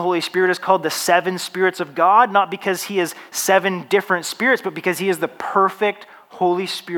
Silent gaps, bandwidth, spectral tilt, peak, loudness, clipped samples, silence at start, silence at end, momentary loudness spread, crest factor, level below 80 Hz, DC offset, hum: none; 19 kHz; -3.5 dB/octave; -2 dBFS; -19 LUFS; under 0.1%; 0 s; 0 s; 8 LU; 18 dB; -78 dBFS; under 0.1%; none